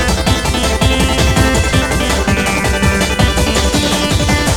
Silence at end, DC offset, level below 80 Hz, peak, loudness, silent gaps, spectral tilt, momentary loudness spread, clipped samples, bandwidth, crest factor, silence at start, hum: 0 s; 0.5%; -18 dBFS; 0 dBFS; -13 LUFS; none; -4 dB/octave; 2 LU; under 0.1%; 18.5 kHz; 12 dB; 0 s; none